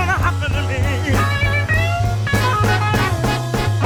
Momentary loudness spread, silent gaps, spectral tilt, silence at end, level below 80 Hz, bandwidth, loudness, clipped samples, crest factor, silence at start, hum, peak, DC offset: 3 LU; none; -5.5 dB/octave; 0 s; -28 dBFS; 17 kHz; -18 LUFS; under 0.1%; 14 dB; 0 s; none; -2 dBFS; under 0.1%